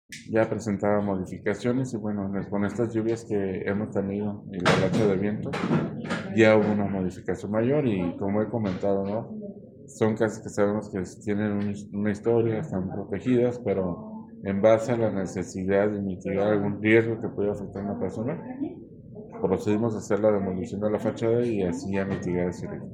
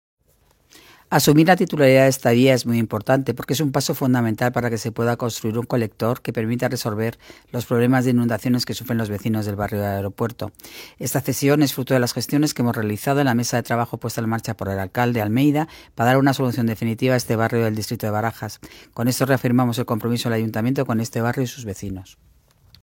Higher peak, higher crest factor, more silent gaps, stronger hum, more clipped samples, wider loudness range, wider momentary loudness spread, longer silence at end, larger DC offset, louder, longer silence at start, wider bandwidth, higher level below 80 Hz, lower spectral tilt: about the same, -4 dBFS vs -2 dBFS; about the same, 22 dB vs 20 dB; neither; neither; neither; about the same, 4 LU vs 5 LU; about the same, 10 LU vs 10 LU; second, 0 s vs 0.8 s; neither; second, -26 LUFS vs -21 LUFS; second, 0.1 s vs 1.1 s; second, 10.5 kHz vs 17 kHz; about the same, -58 dBFS vs -54 dBFS; first, -7 dB/octave vs -5.5 dB/octave